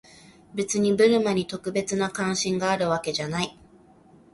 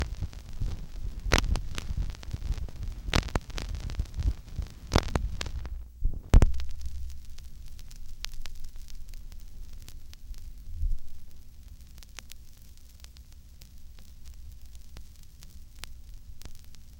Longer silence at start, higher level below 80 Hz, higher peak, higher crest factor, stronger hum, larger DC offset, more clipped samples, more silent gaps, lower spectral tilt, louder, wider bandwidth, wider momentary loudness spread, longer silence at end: first, 0.55 s vs 0 s; second, -60 dBFS vs -34 dBFS; second, -8 dBFS vs -4 dBFS; second, 18 dB vs 26 dB; neither; neither; neither; neither; about the same, -4.5 dB/octave vs -4.5 dB/octave; first, -24 LUFS vs -33 LUFS; second, 11.5 kHz vs 17.5 kHz; second, 10 LU vs 24 LU; first, 0.85 s vs 0 s